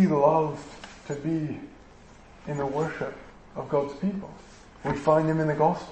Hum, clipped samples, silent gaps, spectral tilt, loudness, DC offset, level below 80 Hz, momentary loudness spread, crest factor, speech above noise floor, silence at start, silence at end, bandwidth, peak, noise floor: none; under 0.1%; none; -8 dB/octave; -27 LUFS; under 0.1%; -54 dBFS; 21 LU; 18 dB; 24 dB; 0 s; 0 s; 8.6 kHz; -8 dBFS; -50 dBFS